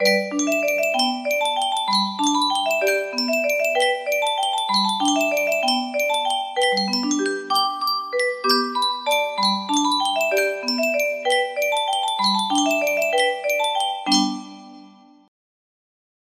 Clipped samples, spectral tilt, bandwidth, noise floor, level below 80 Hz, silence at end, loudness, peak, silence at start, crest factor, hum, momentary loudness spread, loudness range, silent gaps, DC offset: under 0.1%; -2 dB/octave; 15.5 kHz; -47 dBFS; -72 dBFS; 1.4 s; -20 LUFS; -6 dBFS; 0 s; 16 dB; none; 3 LU; 1 LU; none; under 0.1%